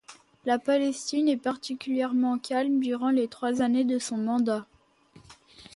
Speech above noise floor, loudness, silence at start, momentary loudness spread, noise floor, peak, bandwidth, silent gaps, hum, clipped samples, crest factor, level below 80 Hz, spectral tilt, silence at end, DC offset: 31 dB; -27 LUFS; 0.1 s; 5 LU; -57 dBFS; -12 dBFS; 11.5 kHz; none; none; under 0.1%; 16 dB; -72 dBFS; -4 dB/octave; 0.1 s; under 0.1%